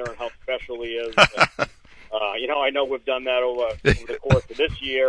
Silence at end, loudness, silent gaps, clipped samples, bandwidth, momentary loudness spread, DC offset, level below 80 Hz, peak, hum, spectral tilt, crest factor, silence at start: 0 s; -22 LUFS; none; under 0.1%; 10.5 kHz; 12 LU; under 0.1%; -40 dBFS; 0 dBFS; none; -4.5 dB/octave; 22 dB; 0 s